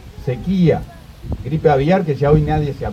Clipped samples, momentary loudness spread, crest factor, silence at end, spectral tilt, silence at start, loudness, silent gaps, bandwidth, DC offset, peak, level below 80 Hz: under 0.1%; 14 LU; 16 dB; 0 s; -9 dB/octave; 0 s; -17 LUFS; none; 7.4 kHz; under 0.1%; 0 dBFS; -32 dBFS